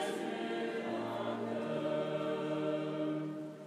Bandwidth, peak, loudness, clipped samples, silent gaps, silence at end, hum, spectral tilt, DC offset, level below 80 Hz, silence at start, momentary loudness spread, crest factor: 13.5 kHz; -24 dBFS; -37 LUFS; under 0.1%; none; 0 s; none; -6 dB/octave; under 0.1%; under -90 dBFS; 0 s; 2 LU; 12 dB